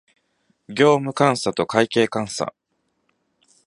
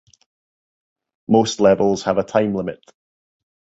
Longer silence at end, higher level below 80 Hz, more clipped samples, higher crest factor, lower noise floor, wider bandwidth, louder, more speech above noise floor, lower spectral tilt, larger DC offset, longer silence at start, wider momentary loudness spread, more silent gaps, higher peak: first, 1.15 s vs 1 s; second, -62 dBFS vs -54 dBFS; neither; about the same, 22 dB vs 20 dB; second, -70 dBFS vs under -90 dBFS; first, 11.5 kHz vs 8 kHz; about the same, -20 LUFS vs -18 LUFS; second, 51 dB vs over 73 dB; about the same, -5 dB/octave vs -5.5 dB/octave; neither; second, 0.7 s vs 1.3 s; about the same, 11 LU vs 12 LU; neither; about the same, 0 dBFS vs -2 dBFS